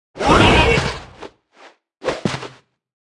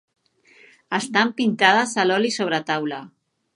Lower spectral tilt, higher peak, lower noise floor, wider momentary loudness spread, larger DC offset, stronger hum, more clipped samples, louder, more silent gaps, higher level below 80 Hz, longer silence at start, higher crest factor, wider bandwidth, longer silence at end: first, -5 dB/octave vs -3.5 dB/octave; about the same, 0 dBFS vs 0 dBFS; second, -48 dBFS vs -54 dBFS; first, 22 LU vs 11 LU; neither; neither; neither; first, -16 LUFS vs -20 LUFS; neither; first, -30 dBFS vs -76 dBFS; second, 0.15 s vs 0.9 s; about the same, 18 dB vs 22 dB; about the same, 12 kHz vs 11.5 kHz; first, 0.65 s vs 0.5 s